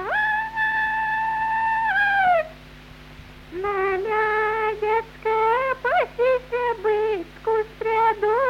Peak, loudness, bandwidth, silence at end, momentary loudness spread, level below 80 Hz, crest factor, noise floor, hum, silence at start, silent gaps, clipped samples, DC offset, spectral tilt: -10 dBFS; -22 LUFS; 14.5 kHz; 0 s; 5 LU; -50 dBFS; 14 dB; -43 dBFS; none; 0 s; none; under 0.1%; under 0.1%; -5 dB/octave